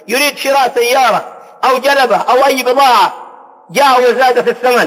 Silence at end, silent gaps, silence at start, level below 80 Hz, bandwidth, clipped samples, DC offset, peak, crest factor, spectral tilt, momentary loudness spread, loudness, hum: 0 s; none; 0.1 s; -62 dBFS; 16.5 kHz; under 0.1%; under 0.1%; -2 dBFS; 10 dB; -2 dB/octave; 7 LU; -10 LUFS; none